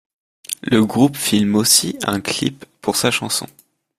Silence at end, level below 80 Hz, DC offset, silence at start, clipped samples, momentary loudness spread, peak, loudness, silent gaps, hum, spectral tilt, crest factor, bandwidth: 0.5 s; -54 dBFS; under 0.1%; 0.5 s; under 0.1%; 13 LU; 0 dBFS; -17 LUFS; none; none; -3.5 dB/octave; 18 dB; 16 kHz